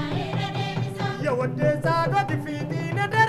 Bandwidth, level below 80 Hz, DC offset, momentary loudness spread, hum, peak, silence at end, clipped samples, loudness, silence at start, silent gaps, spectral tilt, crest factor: 13 kHz; -52 dBFS; under 0.1%; 6 LU; none; -6 dBFS; 0 s; under 0.1%; -25 LUFS; 0 s; none; -6.5 dB/octave; 18 dB